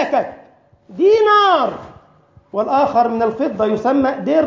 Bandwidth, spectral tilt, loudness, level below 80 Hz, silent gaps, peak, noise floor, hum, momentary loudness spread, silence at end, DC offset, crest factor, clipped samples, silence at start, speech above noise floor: 7.2 kHz; -6 dB/octave; -16 LUFS; -54 dBFS; none; -2 dBFS; -50 dBFS; none; 14 LU; 0 s; under 0.1%; 14 dB; under 0.1%; 0 s; 35 dB